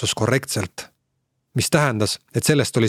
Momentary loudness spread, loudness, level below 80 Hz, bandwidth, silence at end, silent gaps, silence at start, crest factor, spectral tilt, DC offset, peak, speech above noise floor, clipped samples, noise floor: 11 LU; -21 LUFS; -54 dBFS; 16 kHz; 0 s; none; 0 s; 20 dB; -4.5 dB/octave; under 0.1%; 0 dBFS; 53 dB; under 0.1%; -73 dBFS